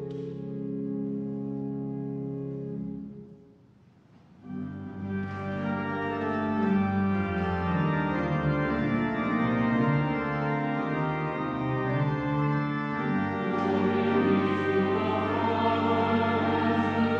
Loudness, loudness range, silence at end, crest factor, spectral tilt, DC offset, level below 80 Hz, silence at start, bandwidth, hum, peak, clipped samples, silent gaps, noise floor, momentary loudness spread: -28 LUFS; 11 LU; 0 s; 16 dB; -9 dB/octave; under 0.1%; -54 dBFS; 0 s; 7.2 kHz; none; -12 dBFS; under 0.1%; none; -57 dBFS; 10 LU